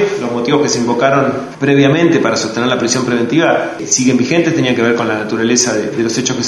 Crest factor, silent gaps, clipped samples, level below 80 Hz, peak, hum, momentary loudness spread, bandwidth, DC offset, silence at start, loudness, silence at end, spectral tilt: 12 dB; none; under 0.1%; -52 dBFS; 0 dBFS; none; 5 LU; 12 kHz; under 0.1%; 0 s; -13 LUFS; 0 s; -4 dB/octave